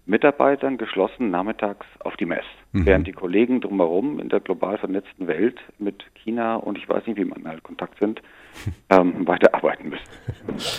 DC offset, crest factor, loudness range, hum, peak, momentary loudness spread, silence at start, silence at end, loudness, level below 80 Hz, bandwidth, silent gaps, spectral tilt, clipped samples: under 0.1%; 22 dB; 5 LU; none; 0 dBFS; 16 LU; 0.05 s; 0 s; -22 LUFS; -42 dBFS; 14.5 kHz; none; -6.5 dB/octave; under 0.1%